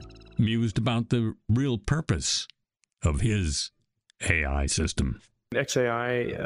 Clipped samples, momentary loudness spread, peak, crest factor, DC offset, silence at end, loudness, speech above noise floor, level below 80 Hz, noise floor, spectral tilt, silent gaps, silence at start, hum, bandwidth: under 0.1%; 7 LU; -8 dBFS; 18 dB; under 0.1%; 0 s; -27 LUFS; 39 dB; -38 dBFS; -66 dBFS; -4.5 dB/octave; none; 0 s; none; 13 kHz